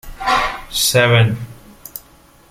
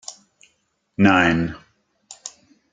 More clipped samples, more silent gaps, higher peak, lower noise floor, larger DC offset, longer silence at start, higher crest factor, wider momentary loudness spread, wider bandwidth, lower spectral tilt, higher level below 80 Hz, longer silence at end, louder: neither; neither; about the same, -2 dBFS vs 0 dBFS; second, -47 dBFS vs -68 dBFS; neither; about the same, 0.05 s vs 0.1 s; second, 16 dB vs 22 dB; about the same, 21 LU vs 23 LU; first, 16.5 kHz vs 9.4 kHz; second, -3.5 dB/octave vs -5.5 dB/octave; first, -38 dBFS vs -52 dBFS; about the same, 0.5 s vs 0.45 s; first, -15 LUFS vs -18 LUFS